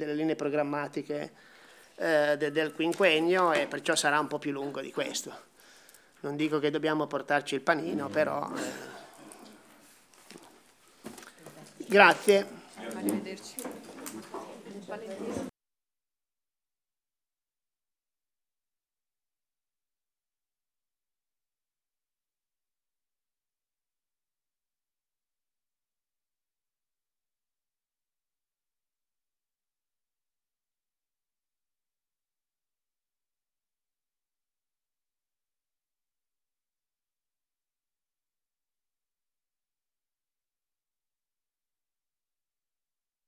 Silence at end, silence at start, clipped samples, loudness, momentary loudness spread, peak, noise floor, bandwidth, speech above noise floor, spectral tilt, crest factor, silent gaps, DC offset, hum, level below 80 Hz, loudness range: 27.8 s; 0 s; under 0.1%; -28 LUFS; 22 LU; -4 dBFS; under -90 dBFS; 16 kHz; over 61 dB; -3.5 dB/octave; 32 dB; none; under 0.1%; none; -80 dBFS; 16 LU